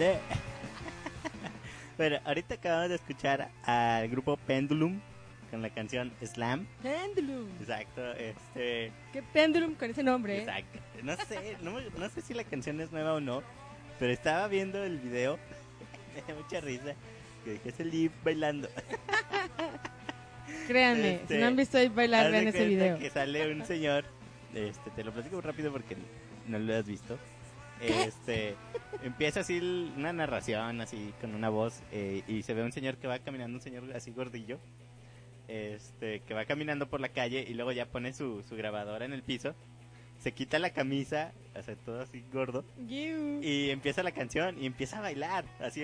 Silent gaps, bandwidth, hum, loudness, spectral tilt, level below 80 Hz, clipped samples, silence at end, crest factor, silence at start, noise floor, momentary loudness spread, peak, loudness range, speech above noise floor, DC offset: none; 10.5 kHz; none; -34 LUFS; -5 dB/octave; -60 dBFS; under 0.1%; 0 s; 22 dB; 0 s; -54 dBFS; 16 LU; -12 dBFS; 10 LU; 20 dB; under 0.1%